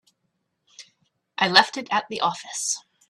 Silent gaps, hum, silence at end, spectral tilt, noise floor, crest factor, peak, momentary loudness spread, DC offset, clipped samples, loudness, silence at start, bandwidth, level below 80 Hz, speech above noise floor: none; none; 0.3 s; -1 dB/octave; -75 dBFS; 26 dB; 0 dBFS; 10 LU; under 0.1%; under 0.1%; -22 LUFS; 0.8 s; 13.5 kHz; -72 dBFS; 53 dB